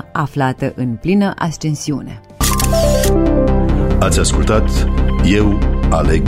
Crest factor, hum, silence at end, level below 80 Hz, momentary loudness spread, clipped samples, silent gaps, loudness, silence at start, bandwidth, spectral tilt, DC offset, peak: 12 dB; none; 0 s; -18 dBFS; 7 LU; under 0.1%; none; -15 LUFS; 0.15 s; 16 kHz; -5.5 dB/octave; under 0.1%; -2 dBFS